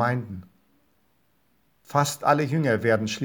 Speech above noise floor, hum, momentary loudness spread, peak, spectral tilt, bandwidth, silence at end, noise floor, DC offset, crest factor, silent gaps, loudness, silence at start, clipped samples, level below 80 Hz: 44 dB; none; 12 LU; -6 dBFS; -5.5 dB/octave; over 20 kHz; 0 s; -68 dBFS; under 0.1%; 20 dB; none; -24 LUFS; 0 s; under 0.1%; -70 dBFS